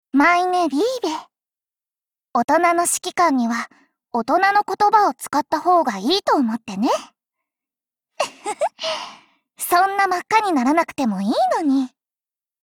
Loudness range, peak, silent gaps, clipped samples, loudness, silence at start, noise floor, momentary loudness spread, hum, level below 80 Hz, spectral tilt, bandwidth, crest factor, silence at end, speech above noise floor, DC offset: 5 LU; -4 dBFS; 2.44-2.48 s; under 0.1%; -19 LUFS; 0.15 s; under -90 dBFS; 11 LU; none; -66 dBFS; -3 dB/octave; 19.5 kHz; 16 dB; 0.75 s; over 71 dB; under 0.1%